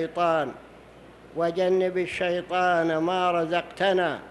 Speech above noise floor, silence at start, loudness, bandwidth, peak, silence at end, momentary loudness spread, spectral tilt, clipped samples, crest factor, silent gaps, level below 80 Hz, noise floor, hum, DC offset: 24 dB; 0 s; -25 LUFS; 11.5 kHz; -10 dBFS; 0 s; 5 LU; -5.5 dB/octave; under 0.1%; 14 dB; none; -60 dBFS; -49 dBFS; none; under 0.1%